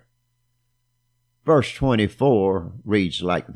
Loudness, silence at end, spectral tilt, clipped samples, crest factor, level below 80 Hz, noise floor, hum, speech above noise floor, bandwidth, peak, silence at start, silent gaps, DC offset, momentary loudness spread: -21 LUFS; 0 s; -7 dB/octave; under 0.1%; 18 dB; -46 dBFS; -70 dBFS; 60 Hz at -45 dBFS; 50 dB; 12 kHz; -6 dBFS; 1.45 s; none; under 0.1%; 5 LU